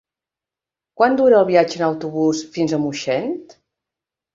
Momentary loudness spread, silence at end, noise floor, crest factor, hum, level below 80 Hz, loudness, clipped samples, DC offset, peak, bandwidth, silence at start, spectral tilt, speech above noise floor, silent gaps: 9 LU; 0.9 s; -88 dBFS; 18 dB; none; -62 dBFS; -18 LUFS; under 0.1%; under 0.1%; -2 dBFS; 7.8 kHz; 1 s; -5.5 dB/octave; 71 dB; none